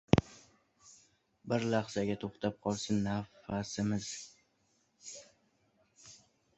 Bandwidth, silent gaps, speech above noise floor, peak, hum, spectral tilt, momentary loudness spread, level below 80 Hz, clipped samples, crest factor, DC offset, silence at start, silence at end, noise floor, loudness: 8.2 kHz; none; 40 dB; -6 dBFS; none; -5.5 dB/octave; 22 LU; -56 dBFS; under 0.1%; 30 dB; under 0.1%; 0.15 s; 0.4 s; -75 dBFS; -35 LUFS